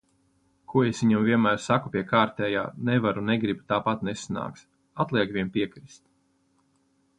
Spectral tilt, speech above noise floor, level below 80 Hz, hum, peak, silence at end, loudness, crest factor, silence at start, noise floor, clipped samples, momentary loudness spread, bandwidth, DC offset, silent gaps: -6 dB/octave; 43 dB; -60 dBFS; none; -8 dBFS; 1.35 s; -26 LUFS; 20 dB; 0.7 s; -68 dBFS; under 0.1%; 10 LU; 9.6 kHz; under 0.1%; none